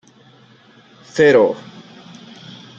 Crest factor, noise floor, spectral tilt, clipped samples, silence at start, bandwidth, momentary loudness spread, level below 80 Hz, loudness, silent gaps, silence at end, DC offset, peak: 18 dB; -48 dBFS; -5.5 dB/octave; under 0.1%; 1.15 s; 7.6 kHz; 27 LU; -64 dBFS; -14 LUFS; none; 1.2 s; under 0.1%; -2 dBFS